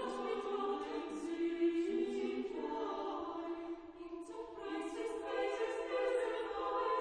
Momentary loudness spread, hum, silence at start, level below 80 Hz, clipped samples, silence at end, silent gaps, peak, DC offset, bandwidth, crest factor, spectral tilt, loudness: 11 LU; none; 0 s; -70 dBFS; under 0.1%; 0 s; none; -26 dBFS; under 0.1%; 10.5 kHz; 14 dB; -4 dB/octave; -40 LUFS